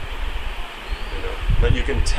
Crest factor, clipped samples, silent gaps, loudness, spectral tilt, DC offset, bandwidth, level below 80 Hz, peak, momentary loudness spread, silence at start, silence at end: 16 dB; under 0.1%; none; -25 LUFS; -5 dB/octave; under 0.1%; 11.5 kHz; -22 dBFS; -4 dBFS; 11 LU; 0 s; 0 s